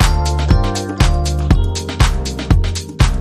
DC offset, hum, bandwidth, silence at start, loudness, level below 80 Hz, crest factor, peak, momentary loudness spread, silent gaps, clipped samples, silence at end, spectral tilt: under 0.1%; none; 14 kHz; 0 s; -17 LUFS; -16 dBFS; 14 dB; 0 dBFS; 5 LU; none; under 0.1%; 0 s; -5 dB/octave